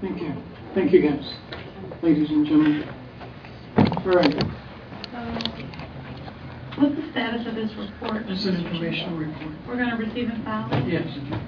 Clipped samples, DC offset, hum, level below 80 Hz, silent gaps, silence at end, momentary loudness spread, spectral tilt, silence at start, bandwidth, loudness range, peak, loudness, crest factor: under 0.1%; under 0.1%; none; -50 dBFS; none; 0 s; 18 LU; -8 dB/octave; 0 s; 5.4 kHz; 6 LU; -4 dBFS; -24 LUFS; 20 dB